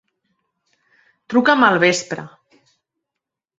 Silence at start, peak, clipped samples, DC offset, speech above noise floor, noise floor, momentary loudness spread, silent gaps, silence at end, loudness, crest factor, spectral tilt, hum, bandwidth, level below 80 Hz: 1.3 s; -2 dBFS; under 0.1%; under 0.1%; 68 dB; -84 dBFS; 16 LU; none; 1.3 s; -15 LUFS; 20 dB; -4 dB/octave; none; 8.2 kHz; -66 dBFS